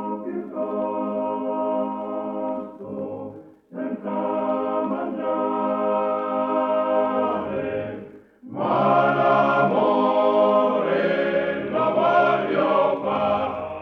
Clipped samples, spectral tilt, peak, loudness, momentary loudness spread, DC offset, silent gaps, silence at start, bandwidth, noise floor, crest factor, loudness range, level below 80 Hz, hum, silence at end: under 0.1%; -8 dB/octave; -8 dBFS; -22 LUFS; 13 LU; under 0.1%; none; 0 s; 6.2 kHz; -43 dBFS; 14 dB; 8 LU; -62 dBFS; none; 0 s